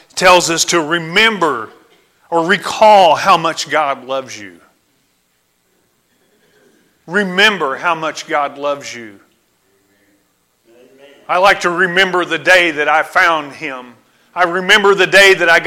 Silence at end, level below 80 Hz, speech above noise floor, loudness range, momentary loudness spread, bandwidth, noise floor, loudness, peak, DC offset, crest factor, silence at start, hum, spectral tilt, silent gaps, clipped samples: 0 s; -54 dBFS; 48 dB; 12 LU; 16 LU; 16.5 kHz; -61 dBFS; -12 LUFS; 0 dBFS; under 0.1%; 14 dB; 0.15 s; none; -2.5 dB/octave; none; under 0.1%